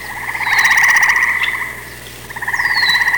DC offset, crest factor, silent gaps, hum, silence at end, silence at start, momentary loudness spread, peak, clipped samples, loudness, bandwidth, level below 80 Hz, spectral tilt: 0.4%; 12 dB; none; 60 Hz at -40 dBFS; 0 s; 0 s; 20 LU; -4 dBFS; under 0.1%; -12 LUFS; 19 kHz; -44 dBFS; 0 dB/octave